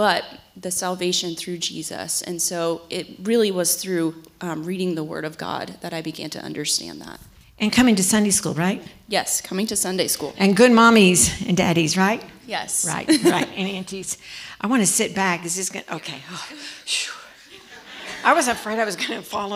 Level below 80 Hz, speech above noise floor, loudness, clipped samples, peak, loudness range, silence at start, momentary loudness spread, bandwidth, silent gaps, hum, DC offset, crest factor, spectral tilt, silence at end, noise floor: -54 dBFS; 24 dB; -21 LUFS; under 0.1%; -2 dBFS; 9 LU; 0 s; 15 LU; 16.5 kHz; none; none; under 0.1%; 20 dB; -3.5 dB/octave; 0 s; -45 dBFS